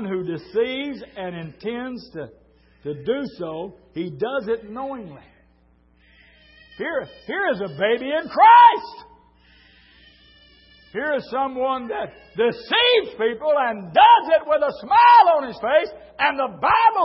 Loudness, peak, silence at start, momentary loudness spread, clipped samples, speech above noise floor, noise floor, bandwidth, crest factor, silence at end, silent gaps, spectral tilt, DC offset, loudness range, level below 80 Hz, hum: -18 LUFS; -2 dBFS; 0 s; 20 LU; under 0.1%; 38 dB; -58 dBFS; 5.8 kHz; 18 dB; 0 s; none; -8.5 dB/octave; under 0.1%; 14 LU; -58 dBFS; none